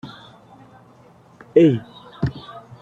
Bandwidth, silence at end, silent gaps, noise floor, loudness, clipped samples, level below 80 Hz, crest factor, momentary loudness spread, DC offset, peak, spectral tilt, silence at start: 7.2 kHz; 0.25 s; none; -50 dBFS; -19 LUFS; under 0.1%; -50 dBFS; 20 dB; 24 LU; under 0.1%; -2 dBFS; -9 dB/octave; 0.05 s